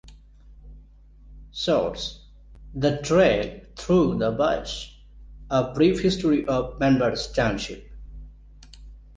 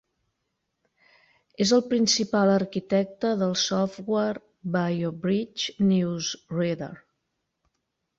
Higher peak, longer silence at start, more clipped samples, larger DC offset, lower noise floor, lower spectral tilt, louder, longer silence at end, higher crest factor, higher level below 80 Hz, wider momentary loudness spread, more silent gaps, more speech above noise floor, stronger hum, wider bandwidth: about the same, -8 dBFS vs -10 dBFS; second, 0.05 s vs 1.6 s; neither; neither; second, -49 dBFS vs -79 dBFS; about the same, -6 dB/octave vs -5 dB/octave; about the same, -23 LUFS vs -25 LUFS; second, 0.15 s vs 1.2 s; about the same, 18 dB vs 16 dB; first, -42 dBFS vs -64 dBFS; first, 19 LU vs 8 LU; neither; second, 27 dB vs 55 dB; first, 50 Hz at -45 dBFS vs none; first, 9.8 kHz vs 7.8 kHz